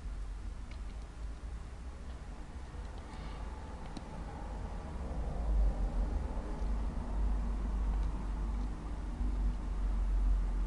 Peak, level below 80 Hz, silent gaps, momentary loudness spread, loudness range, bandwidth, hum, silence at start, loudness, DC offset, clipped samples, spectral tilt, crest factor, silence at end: -22 dBFS; -36 dBFS; none; 11 LU; 9 LU; 9.2 kHz; none; 0 s; -40 LUFS; under 0.1%; under 0.1%; -7.5 dB/octave; 14 dB; 0 s